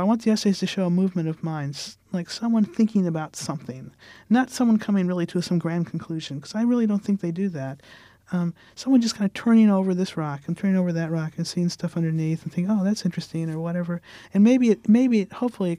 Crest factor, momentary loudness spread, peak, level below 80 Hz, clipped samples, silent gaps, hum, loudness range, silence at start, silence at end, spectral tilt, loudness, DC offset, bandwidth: 14 dB; 13 LU; -8 dBFS; -66 dBFS; under 0.1%; none; none; 4 LU; 0 s; 0 s; -6.5 dB/octave; -24 LUFS; under 0.1%; 12.5 kHz